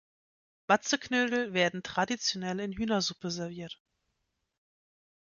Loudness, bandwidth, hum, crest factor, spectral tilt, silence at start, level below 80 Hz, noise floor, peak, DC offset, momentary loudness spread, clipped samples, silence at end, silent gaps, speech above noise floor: -30 LUFS; 7.4 kHz; none; 22 dB; -3.5 dB/octave; 0.7 s; -64 dBFS; -81 dBFS; -12 dBFS; under 0.1%; 14 LU; under 0.1%; 1.5 s; none; 50 dB